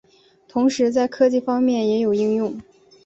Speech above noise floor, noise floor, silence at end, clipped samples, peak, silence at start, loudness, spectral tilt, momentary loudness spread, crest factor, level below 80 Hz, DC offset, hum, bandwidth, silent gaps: 35 dB; -54 dBFS; 0.45 s; under 0.1%; -6 dBFS; 0.55 s; -20 LUFS; -5.5 dB/octave; 8 LU; 16 dB; -62 dBFS; under 0.1%; none; 8 kHz; none